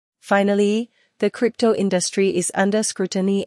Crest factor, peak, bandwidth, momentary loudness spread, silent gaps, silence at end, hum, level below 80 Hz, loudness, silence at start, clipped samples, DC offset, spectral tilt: 14 dB; -6 dBFS; 12 kHz; 6 LU; none; 0 s; none; -70 dBFS; -20 LUFS; 0.25 s; under 0.1%; under 0.1%; -4.5 dB/octave